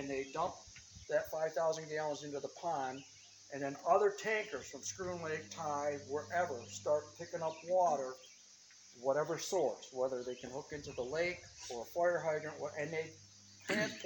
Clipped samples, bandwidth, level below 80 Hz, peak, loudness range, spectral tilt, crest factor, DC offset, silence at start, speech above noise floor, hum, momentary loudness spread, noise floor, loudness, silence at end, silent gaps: under 0.1%; 19 kHz; -72 dBFS; -18 dBFS; 2 LU; -3.5 dB/octave; 20 dB; under 0.1%; 0 s; 23 dB; none; 16 LU; -61 dBFS; -38 LUFS; 0 s; none